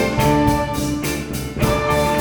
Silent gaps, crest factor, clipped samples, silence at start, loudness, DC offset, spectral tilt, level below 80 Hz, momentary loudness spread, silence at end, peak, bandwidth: none; 16 dB; under 0.1%; 0 s; -19 LUFS; under 0.1%; -5.5 dB/octave; -30 dBFS; 7 LU; 0 s; -2 dBFS; over 20 kHz